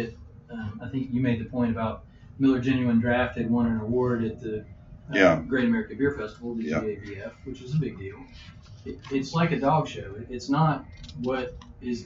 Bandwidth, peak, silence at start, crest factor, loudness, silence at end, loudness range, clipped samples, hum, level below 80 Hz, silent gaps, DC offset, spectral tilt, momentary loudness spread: 7.4 kHz; -4 dBFS; 0 s; 22 dB; -27 LUFS; 0 s; 6 LU; under 0.1%; none; -50 dBFS; none; under 0.1%; -7.5 dB/octave; 18 LU